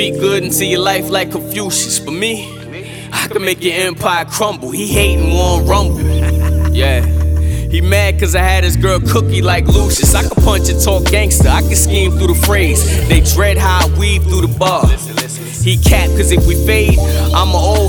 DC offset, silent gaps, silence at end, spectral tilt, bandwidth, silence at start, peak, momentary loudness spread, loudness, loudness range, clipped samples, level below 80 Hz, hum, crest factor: under 0.1%; none; 0 s; -4.5 dB/octave; 19.5 kHz; 0 s; 0 dBFS; 6 LU; -12 LUFS; 5 LU; under 0.1%; -16 dBFS; none; 12 dB